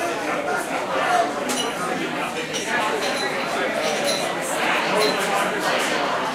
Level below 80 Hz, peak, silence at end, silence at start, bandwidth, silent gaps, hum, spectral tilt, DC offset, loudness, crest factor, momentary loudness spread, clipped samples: -60 dBFS; -6 dBFS; 0 s; 0 s; 16 kHz; none; none; -2.5 dB/octave; under 0.1%; -22 LUFS; 16 dB; 5 LU; under 0.1%